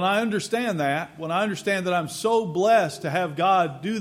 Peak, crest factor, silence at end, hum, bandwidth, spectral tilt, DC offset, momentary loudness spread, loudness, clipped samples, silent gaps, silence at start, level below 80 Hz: -8 dBFS; 16 dB; 0 s; none; 16 kHz; -5 dB/octave; under 0.1%; 6 LU; -23 LUFS; under 0.1%; none; 0 s; -68 dBFS